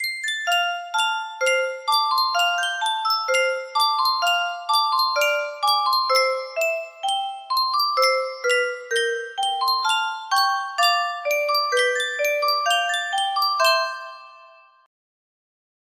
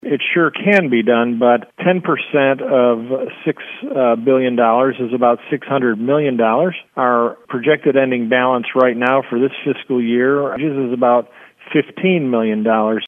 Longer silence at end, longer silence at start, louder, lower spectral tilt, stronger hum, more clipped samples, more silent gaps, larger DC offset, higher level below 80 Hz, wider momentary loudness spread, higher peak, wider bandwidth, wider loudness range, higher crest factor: first, 1.35 s vs 0 s; about the same, 0 s vs 0.05 s; second, -21 LUFS vs -16 LUFS; second, 3.5 dB/octave vs -8.5 dB/octave; neither; neither; neither; neither; second, -76 dBFS vs -68 dBFS; about the same, 5 LU vs 6 LU; second, -6 dBFS vs 0 dBFS; first, 15.5 kHz vs 4.2 kHz; about the same, 2 LU vs 1 LU; about the same, 16 dB vs 16 dB